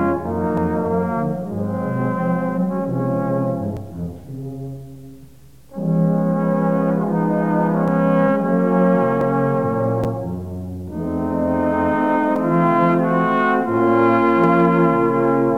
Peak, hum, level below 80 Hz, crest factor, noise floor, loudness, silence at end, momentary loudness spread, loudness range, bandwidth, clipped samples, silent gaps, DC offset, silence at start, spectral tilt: -4 dBFS; none; -48 dBFS; 14 dB; -46 dBFS; -18 LUFS; 0 s; 14 LU; 8 LU; 5.8 kHz; under 0.1%; none; 0.5%; 0 s; -9.5 dB/octave